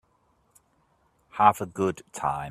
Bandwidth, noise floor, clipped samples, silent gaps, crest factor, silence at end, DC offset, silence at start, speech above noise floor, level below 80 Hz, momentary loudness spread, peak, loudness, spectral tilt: 15 kHz; -67 dBFS; under 0.1%; none; 24 dB; 0 s; under 0.1%; 1.35 s; 43 dB; -60 dBFS; 9 LU; -4 dBFS; -25 LUFS; -5.5 dB/octave